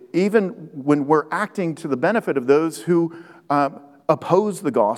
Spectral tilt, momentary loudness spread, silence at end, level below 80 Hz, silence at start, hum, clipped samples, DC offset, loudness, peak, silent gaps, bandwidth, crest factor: -7 dB/octave; 8 LU; 0 s; -80 dBFS; 0.15 s; none; under 0.1%; under 0.1%; -21 LUFS; -2 dBFS; none; 14.5 kHz; 18 dB